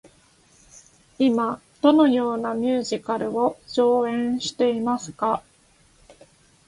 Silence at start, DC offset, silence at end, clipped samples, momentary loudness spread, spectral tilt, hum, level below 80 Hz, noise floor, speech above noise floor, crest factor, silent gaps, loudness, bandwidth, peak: 1.2 s; under 0.1%; 1.3 s; under 0.1%; 8 LU; -5 dB/octave; none; -62 dBFS; -58 dBFS; 37 dB; 20 dB; none; -22 LUFS; 11.5 kHz; -4 dBFS